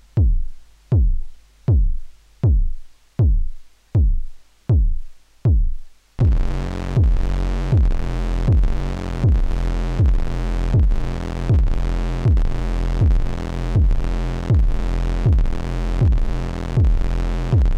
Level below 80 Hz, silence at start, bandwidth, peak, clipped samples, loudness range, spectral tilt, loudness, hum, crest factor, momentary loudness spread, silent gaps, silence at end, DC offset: -20 dBFS; 0.15 s; 7.6 kHz; -8 dBFS; under 0.1%; 2 LU; -8 dB/octave; -21 LUFS; none; 8 dB; 8 LU; none; 0 s; under 0.1%